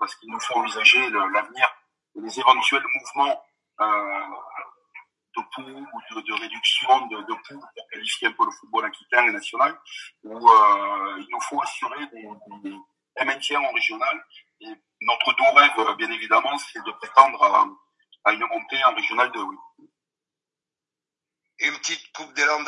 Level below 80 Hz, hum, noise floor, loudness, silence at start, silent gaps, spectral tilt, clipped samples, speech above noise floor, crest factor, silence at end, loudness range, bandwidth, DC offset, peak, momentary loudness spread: -90 dBFS; none; -89 dBFS; -21 LUFS; 0 s; none; -0.5 dB/octave; under 0.1%; 67 dB; 24 dB; 0 s; 8 LU; 11.5 kHz; under 0.1%; 0 dBFS; 22 LU